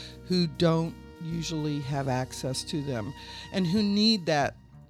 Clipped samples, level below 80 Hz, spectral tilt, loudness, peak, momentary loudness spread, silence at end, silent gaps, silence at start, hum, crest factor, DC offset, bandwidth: under 0.1%; -52 dBFS; -5.5 dB/octave; -28 LUFS; -12 dBFS; 12 LU; 0.1 s; none; 0 s; none; 16 dB; under 0.1%; 14 kHz